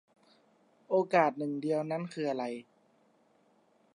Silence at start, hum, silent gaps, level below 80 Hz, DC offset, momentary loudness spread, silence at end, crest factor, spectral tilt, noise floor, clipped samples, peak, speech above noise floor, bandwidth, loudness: 0.9 s; none; none; -90 dBFS; under 0.1%; 10 LU; 1.3 s; 22 dB; -7 dB/octave; -68 dBFS; under 0.1%; -12 dBFS; 37 dB; 11 kHz; -32 LUFS